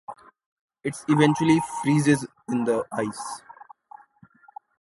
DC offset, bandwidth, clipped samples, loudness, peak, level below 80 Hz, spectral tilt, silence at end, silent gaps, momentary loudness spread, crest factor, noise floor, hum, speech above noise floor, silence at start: under 0.1%; 11.5 kHz; under 0.1%; -24 LUFS; -4 dBFS; -64 dBFS; -6 dB/octave; 1.2 s; 0.46-0.68 s; 16 LU; 22 dB; -55 dBFS; none; 33 dB; 0.1 s